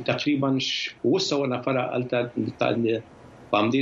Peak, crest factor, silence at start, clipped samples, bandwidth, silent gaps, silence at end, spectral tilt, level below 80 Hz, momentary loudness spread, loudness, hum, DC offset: -8 dBFS; 16 dB; 0 s; under 0.1%; 7.8 kHz; none; 0 s; -5 dB/octave; -64 dBFS; 4 LU; -25 LUFS; none; under 0.1%